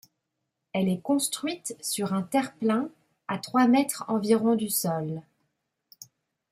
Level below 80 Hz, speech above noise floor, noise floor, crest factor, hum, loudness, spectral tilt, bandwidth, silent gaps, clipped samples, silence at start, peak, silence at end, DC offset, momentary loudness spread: -72 dBFS; 56 dB; -82 dBFS; 18 dB; none; -27 LUFS; -4.5 dB/octave; 16 kHz; none; under 0.1%; 0.75 s; -10 dBFS; 0.5 s; under 0.1%; 12 LU